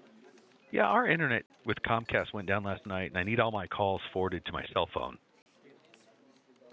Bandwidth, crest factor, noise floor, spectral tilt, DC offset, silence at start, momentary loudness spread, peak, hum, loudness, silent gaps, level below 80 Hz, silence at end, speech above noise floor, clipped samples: 8 kHz; 24 dB; -63 dBFS; -7 dB/octave; under 0.1%; 0.7 s; 9 LU; -10 dBFS; none; -31 LUFS; 1.46-1.50 s; -56 dBFS; 1.55 s; 32 dB; under 0.1%